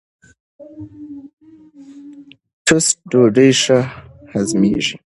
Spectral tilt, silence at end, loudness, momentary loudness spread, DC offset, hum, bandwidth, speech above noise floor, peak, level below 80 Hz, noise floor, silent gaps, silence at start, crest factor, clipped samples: -4 dB/octave; 0.15 s; -15 LUFS; 24 LU; under 0.1%; none; 11.5 kHz; 28 dB; 0 dBFS; -52 dBFS; -43 dBFS; 1.33-1.37 s, 2.53-2.65 s; 0.6 s; 18 dB; under 0.1%